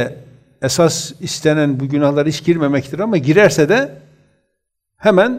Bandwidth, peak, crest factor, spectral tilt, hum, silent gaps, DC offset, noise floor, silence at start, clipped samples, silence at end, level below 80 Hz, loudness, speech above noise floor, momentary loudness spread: 16 kHz; 0 dBFS; 16 dB; -5 dB/octave; none; none; under 0.1%; -73 dBFS; 0 s; under 0.1%; 0 s; -54 dBFS; -15 LUFS; 59 dB; 11 LU